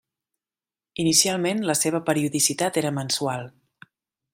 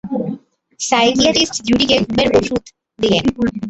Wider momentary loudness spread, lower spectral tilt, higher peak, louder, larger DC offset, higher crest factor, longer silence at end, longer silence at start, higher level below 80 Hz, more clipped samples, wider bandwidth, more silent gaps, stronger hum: about the same, 12 LU vs 12 LU; about the same, -3 dB/octave vs -3.5 dB/octave; second, -4 dBFS vs 0 dBFS; second, -22 LUFS vs -15 LUFS; neither; about the same, 20 dB vs 16 dB; first, 0.85 s vs 0 s; first, 1 s vs 0.05 s; second, -66 dBFS vs -42 dBFS; neither; first, 16 kHz vs 8.2 kHz; neither; neither